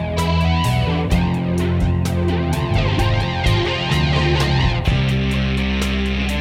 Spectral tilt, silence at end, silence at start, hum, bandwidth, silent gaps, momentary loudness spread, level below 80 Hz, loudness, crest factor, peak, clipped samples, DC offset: -6 dB/octave; 0 s; 0 s; none; 16 kHz; none; 3 LU; -24 dBFS; -18 LUFS; 14 dB; -4 dBFS; under 0.1%; under 0.1%